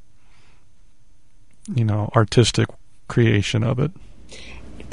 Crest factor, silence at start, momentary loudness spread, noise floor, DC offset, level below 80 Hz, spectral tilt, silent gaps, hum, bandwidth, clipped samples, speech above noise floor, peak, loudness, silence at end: 20 dB; 1.7 s; 23 LU; -57 dBFS; 1%; -44 dBFS; -6 dB/octave; none; none; 11 kHz; under 0.1%; 38 dB; -2 dBFS; -20 LUFS; 0 s